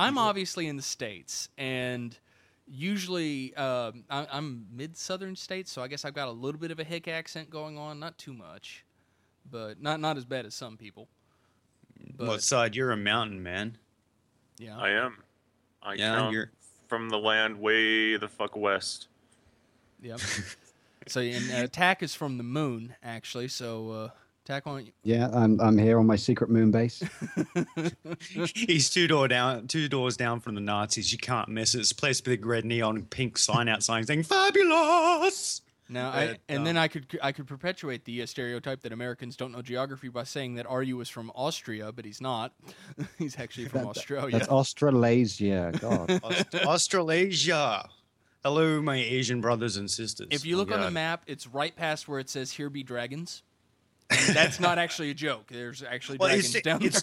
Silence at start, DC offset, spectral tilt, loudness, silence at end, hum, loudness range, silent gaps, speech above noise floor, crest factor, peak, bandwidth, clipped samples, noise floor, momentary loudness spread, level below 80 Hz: 0 s; under 0.1%; -4 dB/octave; -28 LUFS; 0 s; none; 11 LU; none; 42 dB; 24 dB; -6 dBFS; 15 kHz; under 0.1%; -70 dBFS; 16 LU; -66 dBFS